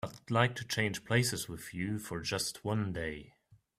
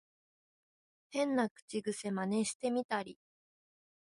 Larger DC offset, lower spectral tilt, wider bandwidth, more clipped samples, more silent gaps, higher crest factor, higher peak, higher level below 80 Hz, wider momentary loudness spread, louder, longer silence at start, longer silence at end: neither; about the same, -4.5 dB/octave vs -4.5 dB/octave; first, 16 kHz vs 11.5 kHz; neither; second, none vs 1.51-1.55 s, 1.62-1.68 s, 2.55-2.60 s, 2.84-2.89 s; first, 24 dB vs 18 dB; first, -10 dBFS vs -20 dBFS; first, -60 dBFS vs -82 dBFS; about the same, 9 LU vs 7 LU; about the same, -34 LUFS vs -36 LUFS; second, 0.05 s vs 1.1 s; second, 0.25 s vs 1 s